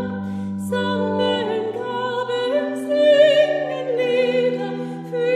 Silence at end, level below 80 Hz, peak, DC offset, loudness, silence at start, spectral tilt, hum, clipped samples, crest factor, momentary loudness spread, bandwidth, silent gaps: 0 s; -66 dBFS; -2 dBFS; under 0.1%; -20 LUFS; 0 s; -5.5 dB/octave; none; under 0.1%; 16 dB; 13 LU; 13.5 kHz; none